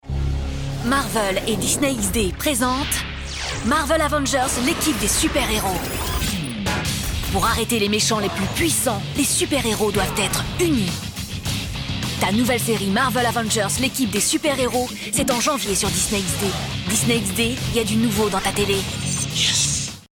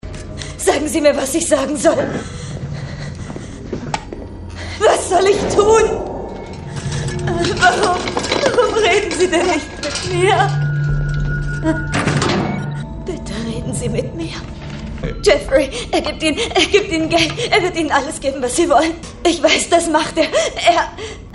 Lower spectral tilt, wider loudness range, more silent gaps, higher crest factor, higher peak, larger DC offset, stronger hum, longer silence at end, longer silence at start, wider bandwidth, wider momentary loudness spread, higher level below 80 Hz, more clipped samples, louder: about the same, -3.5 dB/octave vs -4 dB/octave; second, 2 LU vs 5 LU; neither; about the same, 14 dB vs 16 dB; second, -8 dBFS vs 0 dBFS; neither; neither; first, 0.15 s vs 0 s; about the same, 0.05 s vs 0.05 s; first, over 20 kHz vs 11.5 kHz; second, 6 LU vs 15 LU; about the same, -34 dBFS vs -32 dBFS; neither; second, -20 LUFS vs -16 LUFS